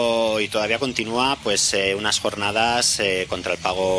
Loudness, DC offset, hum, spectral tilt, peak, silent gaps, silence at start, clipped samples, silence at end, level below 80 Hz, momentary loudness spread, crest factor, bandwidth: -20 LUFS; under 0.1%; none; -2 dB/octave; -4 dBFS; none; 0 s; under 0.1%; 0 s; -50 dBFS; 5 LU; 18 dB; 11 kHz